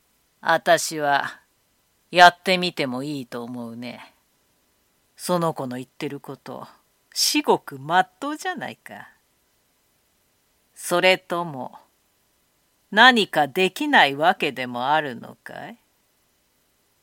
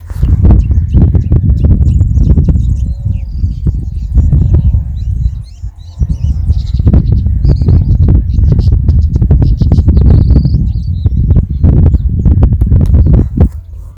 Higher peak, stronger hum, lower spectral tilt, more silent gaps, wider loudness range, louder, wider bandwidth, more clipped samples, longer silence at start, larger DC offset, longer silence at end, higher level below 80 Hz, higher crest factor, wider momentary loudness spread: about the same, 0 dBFS vs 0 dBFS; neither; second, -3 dB/octave vs -10.5 dB/octave; neither; first, 11 LU vs 4 LU; second, -20 LUFS vs -10 LUFS; first, 17 kHz vs 5.4 kHz; second, under 0.1% vs 3%; first, 0.45 s vs 0 s; neither; first, 1.3 s vs 0.05 s; second, -72 dBFS vs -12 dBFS; first, 24 dB vs 8 dB; first, 24 LU vs 8 LU